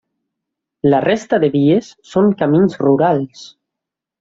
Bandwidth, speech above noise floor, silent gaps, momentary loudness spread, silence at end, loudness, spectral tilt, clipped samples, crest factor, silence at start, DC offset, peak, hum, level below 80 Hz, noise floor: 7.8 kHz; 69 dB; none; 6 LU; 0.75 s; -15 LUFS; -7.5 dB/octave; under 0.1%; 14 dB; 0.85 s; under 0.1%; -2 dBFS; none; -56 dBFS; -83 dBFS